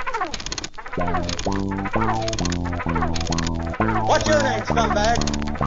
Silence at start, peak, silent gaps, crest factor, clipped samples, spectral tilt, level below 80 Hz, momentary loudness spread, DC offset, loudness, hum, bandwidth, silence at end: 0 s; -4 dBFS; none; 16 dB; under 0.1%; -4.5 dB/octave; -32 dBFS; 8 LU; 0.5%; -23 LUFS; none; 7.8 kHz; 0 s